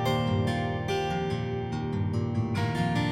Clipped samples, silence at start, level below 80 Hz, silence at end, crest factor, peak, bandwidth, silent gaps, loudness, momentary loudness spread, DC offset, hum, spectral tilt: under 0.1%; 0 s; -48 dBFS; 0 s; 14 dB; -14 dBFS; 16 kHz; none; -29 LUFS; 4 LU; under 0.1%; none; -7 dB/octave